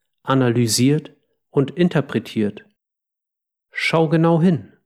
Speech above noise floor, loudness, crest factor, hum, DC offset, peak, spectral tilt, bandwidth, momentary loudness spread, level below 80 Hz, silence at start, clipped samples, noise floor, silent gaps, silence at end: 67 dB; -19 LUFS; 16 dB; none; under 0.1%; -4 dBFS; -5.5 dB/octave; 15 kHz; 8 LU; -66 dBFS; 0.25 s; under 0.1%; -84 dBFS; none; 0.2 s